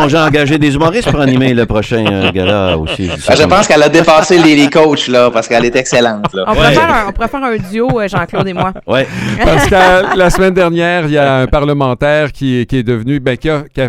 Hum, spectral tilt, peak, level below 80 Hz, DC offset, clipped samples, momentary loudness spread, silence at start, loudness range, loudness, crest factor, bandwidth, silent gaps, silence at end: none; -5.5 dB/octave; 0 dBFS; -26 dBFS; under 0.1%; 0.5%; 8 LU; 0 s; 4 LU; -10 LUFS; 10 dB; 16.5 kHz; none; 0 s